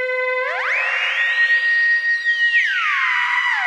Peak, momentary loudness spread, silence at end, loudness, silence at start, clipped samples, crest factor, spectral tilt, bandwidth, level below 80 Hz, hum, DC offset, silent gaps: -6 dBFS; 5 LU; 0 s; -16 LUFS; 0 s; under 0.1%; 12 dB; 3 dB/octave; 10 kHz; -76 dBFS; none; under 0.1%; none